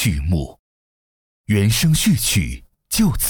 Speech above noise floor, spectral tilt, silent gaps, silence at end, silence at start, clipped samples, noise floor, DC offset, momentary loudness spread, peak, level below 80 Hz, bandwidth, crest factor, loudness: over 73 dB; -4.5 dB/octave; 0.59-1.44 s; 0 s; 0 s; under 0.1%; under -90 dBFS; under 0.1%; 12 LU; -8 dBFS; -32 dBFS; over 20 kHz; 12 dB; -18 LUFS